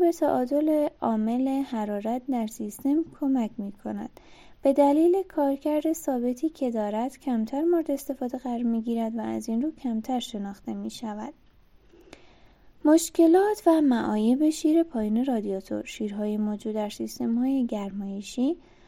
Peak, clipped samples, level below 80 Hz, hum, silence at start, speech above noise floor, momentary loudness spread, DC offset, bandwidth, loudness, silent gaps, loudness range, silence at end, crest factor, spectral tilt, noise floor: -8 dBFS; under 0.1%; -60 dBFS; none; 0 s; 31 dB; 13 LU; under 0.1%; 16.5 kHz; -26 LUFS; none; 7 LU; 0.3 s; 18 dB; -5.5 dB/octave; -56 dBFS